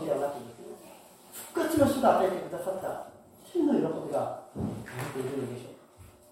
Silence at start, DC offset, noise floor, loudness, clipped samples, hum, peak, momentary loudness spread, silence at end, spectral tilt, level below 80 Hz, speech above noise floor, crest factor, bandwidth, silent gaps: 0 s; under 0.1%; -54 dBFS; -30 LUFS; under 0.1%; none; -10 dBFS; 22 LU; 0.25 s; -6 dB/octave; -62 dBFS; 25 dB; 22 dB; 16.5 kHz; none